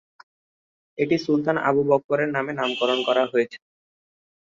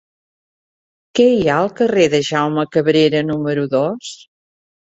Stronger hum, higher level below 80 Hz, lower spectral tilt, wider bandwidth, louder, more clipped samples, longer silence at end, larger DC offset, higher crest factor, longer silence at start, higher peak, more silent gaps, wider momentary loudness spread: neither; second, -68 dBFS vs -56 dBFS; about the same, -6 dB/octave vs -5.5 dB/octave; about the same, 7.6 kHz vs 8 kHz; second, -22 LUFS vs -16 LUFS; neither; first, 1 s vs 0.8 s; neither; about the same, 18 dB vs 16 dB; second, 1 s vs 1.15 s; second, -6 dBFS vs -2 dBFS; first, 2.04-2.09 s vs none; second, 5 LU vs 8 LU